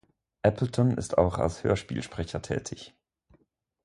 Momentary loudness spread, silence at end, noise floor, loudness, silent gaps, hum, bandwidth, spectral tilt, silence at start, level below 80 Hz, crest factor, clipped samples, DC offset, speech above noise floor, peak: 12 LU; 0.95 s; -68 dBFS; -28 LUFS; none; none; 11.5 kHz; -6.5 dB/octave; 0.45 s; -46 dBFS; 22 dB; under 0.1%; under 0.1%; 40 dB; -6 dBFS